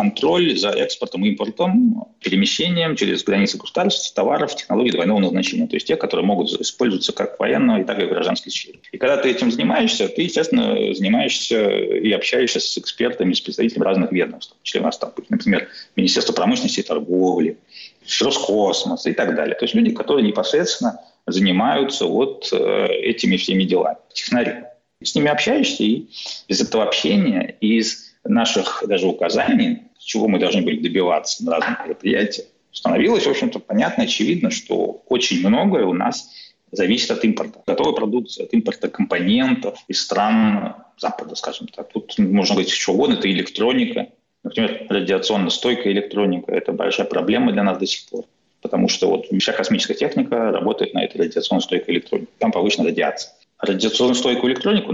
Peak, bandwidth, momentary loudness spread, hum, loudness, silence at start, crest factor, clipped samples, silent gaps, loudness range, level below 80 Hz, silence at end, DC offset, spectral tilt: -8 dBFS; 8 kHz; 8 LU; none; -19 LUFS; 0 s; 12 dB; under 0.1%; none; 2 LU; -60 dBFS; 0 s; under 0.1%; -4.5 dB/octave